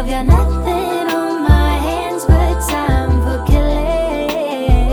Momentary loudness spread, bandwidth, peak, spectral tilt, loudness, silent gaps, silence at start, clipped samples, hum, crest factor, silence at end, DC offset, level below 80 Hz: 5 LU; over 20 kHz; 0 dBFS; -6.5 dB/octave; -15 LUFS; none; 0 s; under 0.1%; none; 14 dB; 0 s; under 0.1%; -16 dBFS